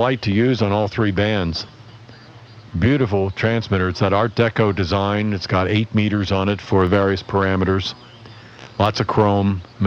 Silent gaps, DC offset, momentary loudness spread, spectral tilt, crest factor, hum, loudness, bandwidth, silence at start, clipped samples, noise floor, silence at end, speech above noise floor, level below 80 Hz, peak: none; under 0.1%; 6 LU; -7 dB/octave; 14 dB; none; -19 LUFS; 7 kHz; 0 s; under 0.1%; -42 dBFS; 0 s; 24 dB; -44 dBFS; -4 dBFS